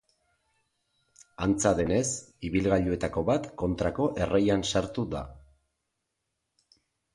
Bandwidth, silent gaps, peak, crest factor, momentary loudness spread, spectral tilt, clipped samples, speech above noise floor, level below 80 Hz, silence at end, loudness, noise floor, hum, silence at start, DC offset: 11.5 kHz; none; -10 dBFS; 20 dB; 8 LU; -5 dB/octave; under 0.1%; 55 dB; -48 dBFS; 1.75 s; -28 LUFS; -82 dBFS; none; 1.4 s; under 0.1%